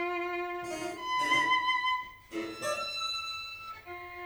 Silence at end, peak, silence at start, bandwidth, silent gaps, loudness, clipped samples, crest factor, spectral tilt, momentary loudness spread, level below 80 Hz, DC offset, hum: 0 s; -16 dBFS; 0 s; over 20 kHz; none; -31 LUFS; under 0.1%; 18 dB; -2 dB/octave; 15 LU; -66 dBFS; under 0.1%; none